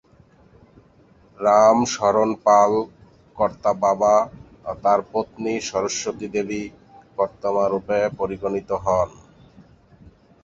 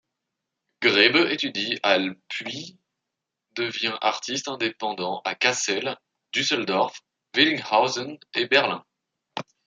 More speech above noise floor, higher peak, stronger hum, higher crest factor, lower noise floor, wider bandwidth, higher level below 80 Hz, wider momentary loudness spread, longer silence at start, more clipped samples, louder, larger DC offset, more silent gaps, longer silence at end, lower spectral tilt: second, 34 dB vs 60 dB; about the same, -2 dBFS vs -2 dBFS; neither; about the same, 20 dB vs 24 dB; second, -54 dBFS vs -84 dBFS; second, 7.8 kHz vs 9.6 kHz; first, -52 dBFS vs -76 dBFS; about the same, 13 LU vs 15 LU; first, 1.4 s vs 0.8 s; neither; about the same, -21 LUFS vs -23 LUFS; neither; neither; first, 1.35 s vs 0.25 s; first, -4.5 dB/octave vs -2.5 dB/octave